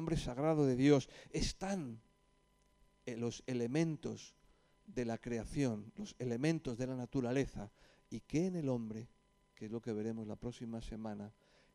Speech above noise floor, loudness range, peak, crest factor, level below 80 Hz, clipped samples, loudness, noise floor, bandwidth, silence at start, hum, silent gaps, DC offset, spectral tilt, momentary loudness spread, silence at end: 35 dB; 5 LU; -18 dBFS; 22 dB; -56 dBFS; under 0.1%; -39 LUFS; -73 dBFS; 12 kHz; 0 s; none; none; under 0.1%; -6.5 dB/octave; 17 LU; 0.45 s